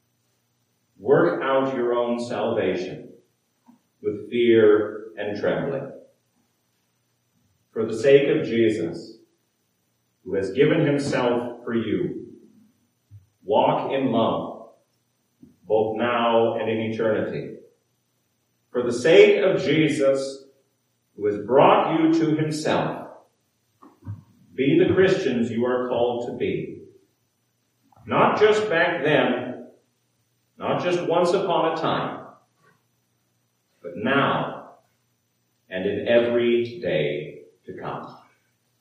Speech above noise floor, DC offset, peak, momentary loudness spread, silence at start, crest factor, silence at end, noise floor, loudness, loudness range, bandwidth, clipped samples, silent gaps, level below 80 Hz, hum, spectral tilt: 50 dB; under 0.1%; -2 dBFS; 19 LU; 1 s; 22 dB; 0.65 s; -71 dBFS; -22 LUFS; 5 LU; 11.5 kHz; under 0.1%; none; -70 dBFS; none; -6 dB/octave